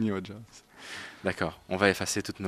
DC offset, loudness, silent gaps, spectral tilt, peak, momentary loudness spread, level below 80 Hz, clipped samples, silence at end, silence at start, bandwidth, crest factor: under 0.1%; -30 LUFS; none; -4 dB/octave; -6 dBFS; 19 LU; -60 dBFS; under 0.1%; 0 s; 0 s; 14.5 kHz; 26 dB